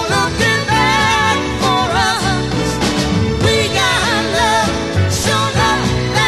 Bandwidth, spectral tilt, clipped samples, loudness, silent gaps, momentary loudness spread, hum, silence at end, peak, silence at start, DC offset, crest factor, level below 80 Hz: 13 kHz; -4 dB/octave; under 0.1%; -14 LUFS; none; 4 LU; none; 0 s; 0 dBFS; 0 s; 0.5%; 14 dB; -28 dBFS